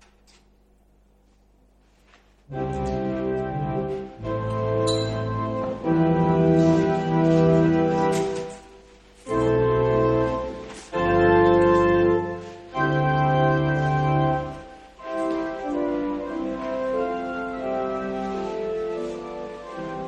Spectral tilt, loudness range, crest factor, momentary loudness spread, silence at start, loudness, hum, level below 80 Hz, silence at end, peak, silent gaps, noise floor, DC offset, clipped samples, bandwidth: -7.5 dB/octave; 9 LU; 18 dB; 14 LU; 2.5 s; -23 LUFS; 50 Hz at -50 dBFS; -44 dBFS; 0 s; -6 dBFS; none; -58 dBFS; under 0.1%; under 0.1%; 11 kHz